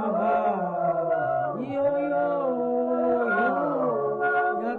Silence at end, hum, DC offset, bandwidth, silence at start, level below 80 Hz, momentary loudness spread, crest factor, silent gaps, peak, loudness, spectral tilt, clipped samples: 0 s; none; under 0.1%; 4.4 kHz; 0 s; -66 dBFS; 3 LU; 10 dB; none; -14 dBFS; -25 LUFS; -9 dB/octave; under 0.1%